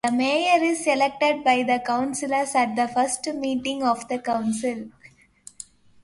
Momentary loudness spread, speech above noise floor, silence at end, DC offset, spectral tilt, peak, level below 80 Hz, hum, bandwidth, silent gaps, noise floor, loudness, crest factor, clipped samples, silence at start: 15 LU; 31 dB; 0.4 s; under 0.1%; -3 dB/octave; -8 dBFS; -64 dBFS; none; 11.5 kHz; none; -54 dBFS; -23 LUFS; 16 dB; under 0.1%; 0.05 s